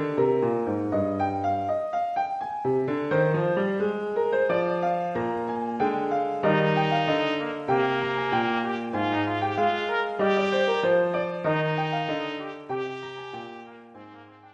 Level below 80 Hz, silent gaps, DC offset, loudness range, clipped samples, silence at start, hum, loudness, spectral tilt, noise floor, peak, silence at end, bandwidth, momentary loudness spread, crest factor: -66 dBFS; none; under 0.1%; 2 LU; under 0.1%; 0 s; none; -26 LUFS; -7 dB/octave; -48 dBFS; -10 dBFS; 0.05 s; 8.4 kHz; 9 LU; 16 dB